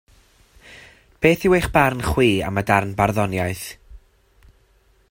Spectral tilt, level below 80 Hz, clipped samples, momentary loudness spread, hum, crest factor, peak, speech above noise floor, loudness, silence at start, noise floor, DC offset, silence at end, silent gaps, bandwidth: -6 dB/octave; -40 dBFS; under 0.1%; 9 LU; none; 20 dB; -2 dBFS; 39 dB; -19 LUFS; 0.7 s; -58 dBFS; under 0.1%; 1.15 s; none; 16.5 kHz